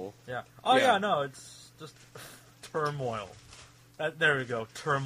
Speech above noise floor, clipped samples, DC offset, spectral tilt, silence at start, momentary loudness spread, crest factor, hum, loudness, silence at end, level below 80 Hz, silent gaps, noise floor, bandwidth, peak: 24 dB; under 0.1%; under 0.1%; -4.5 dB/octave; 0 s; 24 LU; 20 dB; none; -29 LUFS; 0 s; -68 dBFS; none; -54 dBFS; 15.5 kHz; -12 dBFS